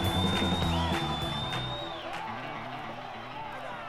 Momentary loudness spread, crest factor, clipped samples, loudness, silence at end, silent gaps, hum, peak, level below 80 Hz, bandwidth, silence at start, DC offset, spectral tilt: 12 LU; 16 dB; under 0.1%; -32 LUFS; 0 s; none; none; -16 dBFS; -46 dBFS; 16 kHz; 0 s; under 0.1%; -5 dB/octave